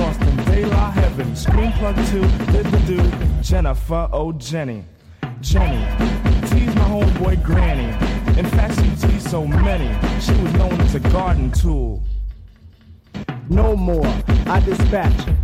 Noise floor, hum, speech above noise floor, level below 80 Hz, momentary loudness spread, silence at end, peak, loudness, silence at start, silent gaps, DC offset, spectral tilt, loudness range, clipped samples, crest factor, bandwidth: -43 dBFS; none; 28 dB; -20 dBFS; 8 LU; 0 s; -8 dBFS; -18 LUFS; 0 s; none; under 0.1%; -7 dB/octave; 3 LU; under 0.1%; 10 dB; 14.5 kHz